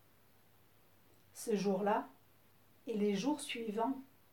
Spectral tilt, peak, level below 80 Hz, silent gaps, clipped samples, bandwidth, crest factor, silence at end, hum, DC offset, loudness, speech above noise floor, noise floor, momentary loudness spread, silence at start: -5.5 dB/octave; -22 dBFS; -84 dBFS; none; under 0.1%; 19 kHz; 18 dB; 0.3 s; none; under 0.1%; -37 LUFS; 33 dB; -69 dBFS; 15 LU; 1.35 s